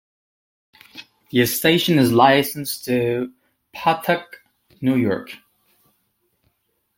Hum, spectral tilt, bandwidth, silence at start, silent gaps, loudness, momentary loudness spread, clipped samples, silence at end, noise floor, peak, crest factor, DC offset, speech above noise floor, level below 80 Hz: none; -5 dB/octave; 17 kHz; 0.95 s; none; -19 LUFS; 26 LU; under 0.1%; 1.6 s; -69 dBFS; -2 dBFS; 20 dB; under 0.1%; 50 dB; -60 dBFS